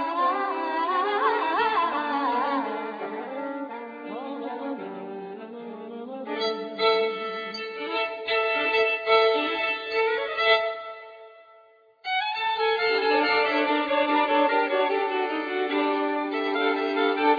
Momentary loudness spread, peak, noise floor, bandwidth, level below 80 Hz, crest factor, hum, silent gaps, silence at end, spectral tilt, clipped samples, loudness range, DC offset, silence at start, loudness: 15 LU; -8 dBFS; -56 dBFS; 5 kHz; -70 dBFS; 18 dB; none; none; 0 s; -4.5 dB/octave; under 0.1%; 9 LU; under 0.1%; 0 s; -25 LUFS